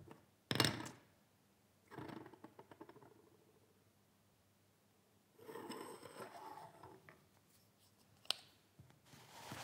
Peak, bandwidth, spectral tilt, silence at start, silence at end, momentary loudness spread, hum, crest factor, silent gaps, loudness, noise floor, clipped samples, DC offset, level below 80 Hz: -16 dBFS; 16 kHz; -3.5 dB/octave; 0 s; 0 s; 28 LU; none; 36 dB; none; -45 LUFS; -74 dBFS; under 0.1%; under 0.1%; -86 dBFS